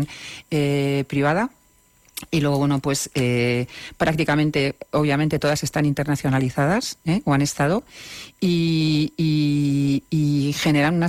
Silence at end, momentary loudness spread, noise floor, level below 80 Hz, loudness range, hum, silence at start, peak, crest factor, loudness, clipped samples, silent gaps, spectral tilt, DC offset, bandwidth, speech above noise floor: 0 s; 6 LU; -58 dBFS; -48 dBFS; 2 LU; none; 0 s; -10 dBFS; 12 dB; -21 LUFS; under 0.1%; none; -5.5 dB/octave; under 0.1%; 16 kHz; 37 dB